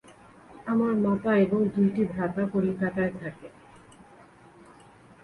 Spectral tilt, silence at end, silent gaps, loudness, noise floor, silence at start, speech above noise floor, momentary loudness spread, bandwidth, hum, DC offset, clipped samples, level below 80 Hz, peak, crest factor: -9 dB/octave; 1.75 s; none; -26 LUFS; -53 dBFS; 0.1 s; 28 dB; 16 LU; 10 kHz; none; under 0.1%; under 0.1%; -60 dBFS; -12 dBFS; 16 dB